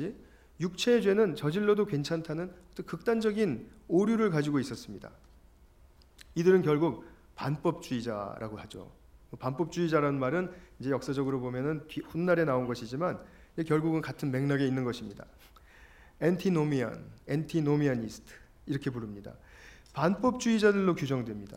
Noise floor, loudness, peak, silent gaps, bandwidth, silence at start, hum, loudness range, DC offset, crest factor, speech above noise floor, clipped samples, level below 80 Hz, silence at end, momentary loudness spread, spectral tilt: -59 dBFS; -30 LUFS; -12 dBFS; none; 16 kHz; 0 s; none; 3 LU; under 0.1%; 20 dB; 29 dB; under 0.1%; -58 dBFS; 0 s; 17 LU; -6.5 dB/octave